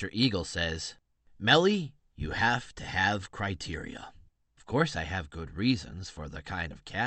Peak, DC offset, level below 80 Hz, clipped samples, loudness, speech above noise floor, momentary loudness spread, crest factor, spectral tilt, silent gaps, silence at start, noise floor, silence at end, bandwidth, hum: -6 dBFS; under 0.1%; -50 dBFS; under 0.1%; -30 LUFS; 29 dB; 17 LU; 24 dB; -4.5 dB/octave; none; 0 s; -59 dBFS; 0 s; 8.8 kHz; none